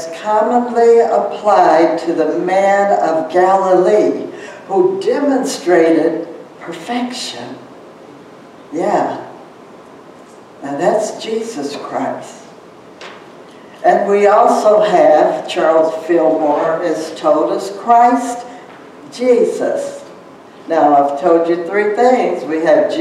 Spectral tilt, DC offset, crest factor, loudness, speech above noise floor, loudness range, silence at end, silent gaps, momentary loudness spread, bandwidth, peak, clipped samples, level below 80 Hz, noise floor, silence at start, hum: -5 dB/octave; under 0.1%; 14 dB; -13 LUFS; 25 dB; 9 LU; 0 s; none; 18 LU; 12.5 kHz; 0 dBFS; under 0.1%; -66 dBFS; -38 dBFS; 0 s; none